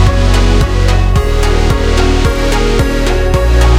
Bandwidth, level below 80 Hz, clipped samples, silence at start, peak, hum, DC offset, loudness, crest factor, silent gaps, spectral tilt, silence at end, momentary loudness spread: 15.5 kHz; -10 dBFS; 0.3%; 0 s; 0 dBFS; none; 0.7%; -12 LUFS; 8 dB; none; -5.5 dB/octave; 0 s; 2 LU